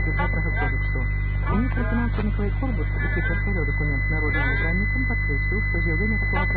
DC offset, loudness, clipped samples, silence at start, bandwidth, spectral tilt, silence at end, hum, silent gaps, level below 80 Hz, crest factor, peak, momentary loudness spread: under 0.1%; -24 LUFS; under 0.1%; 0 s; 4.4 kHz; -11 dB/octave; 0 s; 50 Hz at -25 dBFS; none; -26 dBFS; 12 dB; -10 dBFS; 3 LU